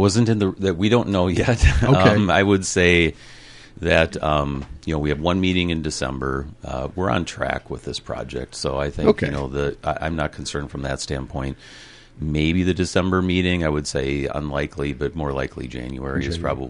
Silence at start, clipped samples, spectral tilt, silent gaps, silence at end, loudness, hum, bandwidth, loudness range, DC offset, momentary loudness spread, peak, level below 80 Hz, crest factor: 0 s; under 0.1%; -5.5 dB/octave; none; 0 s; -21 LUFS; none; 11.5 kHz; 7 LU; under 0.1%; 13 LU; -2 dBFS; -32 dBFS; 18 dB